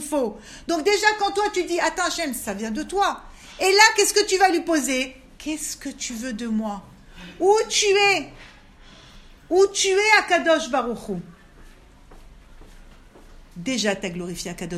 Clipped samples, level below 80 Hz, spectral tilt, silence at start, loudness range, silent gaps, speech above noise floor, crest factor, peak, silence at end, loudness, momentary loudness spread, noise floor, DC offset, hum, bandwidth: under 0.1%; -50 dBFS; -2 dB/octave; 0 s; 10 LU; none; 26 dB; 22 dB; 0 dBFS; 0 s; -21 LUFS; 15 LU; -47 dBFS; under 0.1%; none; 15 kHz